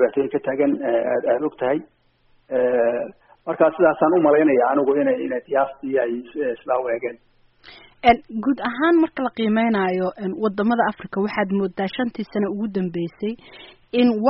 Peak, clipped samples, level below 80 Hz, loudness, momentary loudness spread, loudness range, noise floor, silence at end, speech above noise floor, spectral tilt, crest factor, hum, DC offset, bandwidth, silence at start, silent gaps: -2 dBFS; under 0.1%; -56 dBFS; -21 LUFS; 10 LU; 5 LU; -59 dBFS; 0 s; 39 dB; -5 dB/octave; 20 dB; none; under 0.1%; 5.8 kHz; 0 s; none